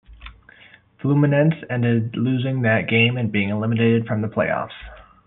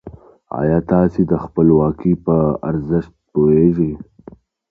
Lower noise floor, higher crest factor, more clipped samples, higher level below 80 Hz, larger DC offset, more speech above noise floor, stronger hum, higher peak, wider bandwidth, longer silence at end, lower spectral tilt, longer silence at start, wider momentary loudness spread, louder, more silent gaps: first, -50 dBFS vs -42 dBFS; about the same, 16 dB vs 16 dB; neither; second, -50 dBFS vs -38 dBFS; neither; about the same, 30 dB vs 27 dB; neither; second, -6 dBFS vs 0 dBFS; first, 4 kHz vs 2.8 kHz; second, 0.25 s vs 0.7 s; second, -6 dB/octave vs -12.5 dB/octave; about the same, 0.1 s vs 0.05 s; about the same, 7 LU vs 9 LU; second, -20 LUFS vs -16 LUFS; neither